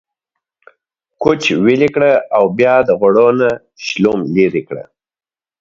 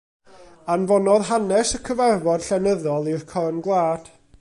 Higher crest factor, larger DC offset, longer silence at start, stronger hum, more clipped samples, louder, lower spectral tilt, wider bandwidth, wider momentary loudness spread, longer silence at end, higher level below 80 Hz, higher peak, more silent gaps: about the same, 14 dB vs 16 dB; neither; first, 1.2 s vs 0.4 s; neither; neither; first, -13 LUFS vs -21 LUFS; about the same, -6 dB/octave vs -5 dB/octave; second, 7.6 kHz vs 11.5 kHz; first, 11 LU vs 7 LU; first, 0.8 s vs 0.35 s; about the same, -52 dBFS vs -50 dBFS; first, 0 dBFS vs -6 dBFS; neither